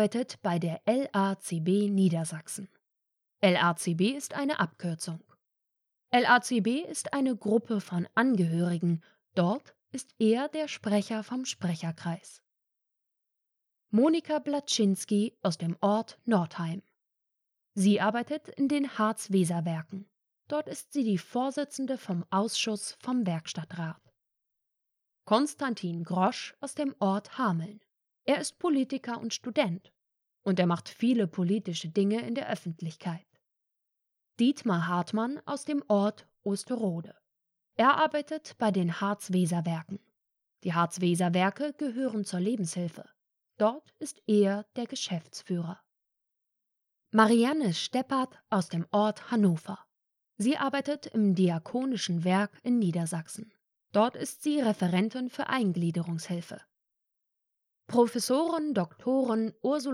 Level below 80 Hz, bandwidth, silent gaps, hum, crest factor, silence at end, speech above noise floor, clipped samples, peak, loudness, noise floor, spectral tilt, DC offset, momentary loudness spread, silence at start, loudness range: -84 dBFS; 14 kHz; none; none; 22 dB; 0 s; 55 dB; under 0.1%; -8 dBFS; -29 LUFS; -84 dBFS; -5.5 dB/octave; under 0.1%; 11 LU; 0 s; 4 LU